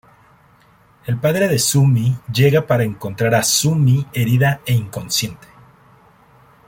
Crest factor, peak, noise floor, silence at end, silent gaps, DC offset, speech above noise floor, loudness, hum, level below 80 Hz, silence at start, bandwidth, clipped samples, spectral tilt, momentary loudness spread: 16 dB; -2 dBFS; -52 dBFS; 1.3 s; none; under 0.1%; 36 dB; -17 LUFS; none; -50 dBFS; 1.05 s; 17 kHz; under 0.1%; -5 dB/octave; 7 LU